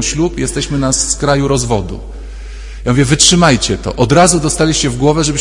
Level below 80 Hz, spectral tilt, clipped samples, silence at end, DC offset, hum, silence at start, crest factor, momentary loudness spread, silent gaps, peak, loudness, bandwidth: -26 dBFS; -4 dB/octave; 0.2%; 0 s; under 0.1%; none; 0 s; 12 dB; 20 LU; none; 0 dBFS; -12 LUFS; 12 kHz